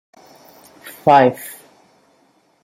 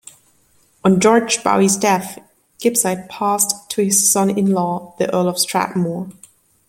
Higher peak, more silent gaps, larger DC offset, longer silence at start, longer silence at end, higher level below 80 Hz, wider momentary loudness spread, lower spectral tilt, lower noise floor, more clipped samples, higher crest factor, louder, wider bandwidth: about the same, -2 dBFS vs 0 dBFS; neither; neither; about the same, 0.85 s vs 0.85 s; first, 1.1 s vs 0.6 s; about the same, -62 dBFS vs -60 dBFS; first, 26 LU vs 9 LU; first, -5.5 dB/octave vs -4 dB/octave; about the same, -58 dBFS vs -57 dBFS; neither; about the same, 18 dB vs 18 dB; about the same, -14 LUFS vs -16 LUFS; about the same, 16.5 kHz vs 16.5 kHz